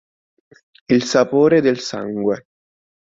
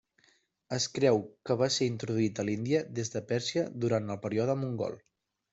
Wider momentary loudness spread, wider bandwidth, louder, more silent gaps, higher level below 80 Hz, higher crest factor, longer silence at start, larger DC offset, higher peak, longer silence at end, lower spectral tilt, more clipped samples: about the same, 10 LU vs 8 LU; about the same, 7.8 kHz vs 8.2 kHz; first, -17 LUFS vs -31 LUFS; neither; first, -60 dBFS vs -68 dBFS; about the same, 18 dB vs 18 dB; first, 0.9 s vs 0.7 s; neither; first, -2 dBFS vs -14 dBFS; first, 0.75 s vs 0.55 s; about the same, -5.5 dB/octave vs -5 dB/octave; neither